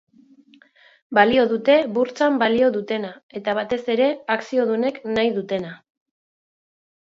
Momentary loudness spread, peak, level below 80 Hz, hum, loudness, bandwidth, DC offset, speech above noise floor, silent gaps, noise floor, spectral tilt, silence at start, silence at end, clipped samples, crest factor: 11 LU; -2 dBFS; -62 dBFS; none; -20 LUFS; 7.6 kHz; under 0.1%; 33 dB; 3.23-3.29 s; -53 dBFS; -5.5 dB/octave; 1.1 s; 1.3 s; under 0.1%; 20 dB